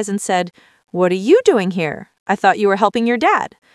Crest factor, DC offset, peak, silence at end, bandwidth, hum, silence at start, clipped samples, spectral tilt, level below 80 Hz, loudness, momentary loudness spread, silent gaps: 16 dB; under 0.1%; 0 dBFS; 0.25 s; 12 kHz; none; 0 s; under 0.1%; -5 dB/octave; -64 dBFS; -16 LUFS; 11 LU; 2.19-2.26 s